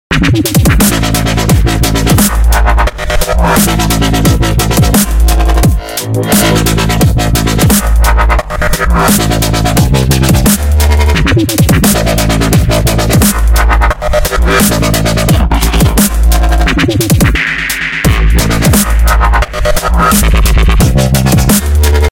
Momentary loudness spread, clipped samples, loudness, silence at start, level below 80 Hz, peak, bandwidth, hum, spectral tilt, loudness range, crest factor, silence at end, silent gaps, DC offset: 3 LU; 0.1%; -9 LUFS; 0.1 s; -12 dBFS; 0 dBFS; 17.5 kHz; none; -4.5 dB/octave; 1 LU; 8 dB; 0 s; none; 0.8%